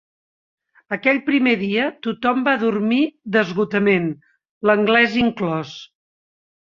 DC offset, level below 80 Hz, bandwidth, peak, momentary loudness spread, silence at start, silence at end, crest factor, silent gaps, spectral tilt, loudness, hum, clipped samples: under 0.1%; -58 dBFS; 7.2 kHz; -2 dBFS; 12 LU; 0.9 s; 0.9 s; 18 dB; 4.49-4.61 s; -6.5 dB/octave; -19 LUFS; none; under 0.1%